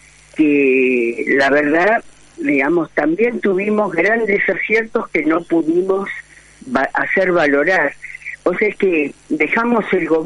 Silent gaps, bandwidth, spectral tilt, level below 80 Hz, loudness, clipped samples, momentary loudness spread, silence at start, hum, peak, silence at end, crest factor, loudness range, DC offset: none; 11 kHz; -6.5 dB/octave; -52 dBFS; -16 LUFS; under 0.1%; 7 LU; 0.35 s; none; -2 dBFS; 0 s; 14 dB; 2 LU; under 0.1%